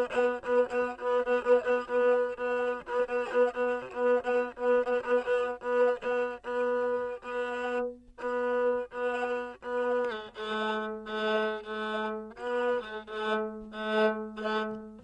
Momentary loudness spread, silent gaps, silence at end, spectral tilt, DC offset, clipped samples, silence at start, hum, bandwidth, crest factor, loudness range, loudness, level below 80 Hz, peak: 8 LU; none; 0 s; -5 dB/octave; under 0.1%; under 0.1%; 0 s; none; 8.4 kHz; 16 dB; 4 LU; -30 LUFS; -64 dBFS; -12 dBFS